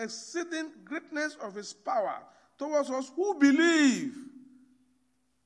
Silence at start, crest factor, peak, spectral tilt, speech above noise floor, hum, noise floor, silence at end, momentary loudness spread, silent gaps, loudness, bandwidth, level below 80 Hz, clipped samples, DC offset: 0 s; 20 dB; -10 dBFS; -3 dB/octave; 45 dB; none; -74 dBFS; 1.05 s; 17 LU; none; -29 LUFS; 11 kHz; -84 dBFS; under 0.1%; under 0.1%